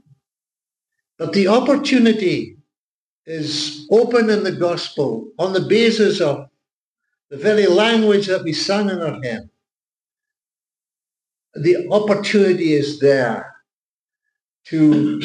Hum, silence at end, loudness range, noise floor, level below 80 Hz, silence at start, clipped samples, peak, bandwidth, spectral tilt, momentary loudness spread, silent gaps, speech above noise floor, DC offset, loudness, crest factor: none; 0 s; 5 LU; under -90 dBFS; -66 dBFS; 1.2 s; under 0.1%; -4 dBFS; 10 kHz; -5.5 dB/octave; 12 LU; 2.78-3.24 s, 6.72-6.96 s, 7.24-7.29 s, 13.73-14.09 s, 14.45-14.49 s; over 74 dB; under 0.1%; -17 LUFS; 14 dB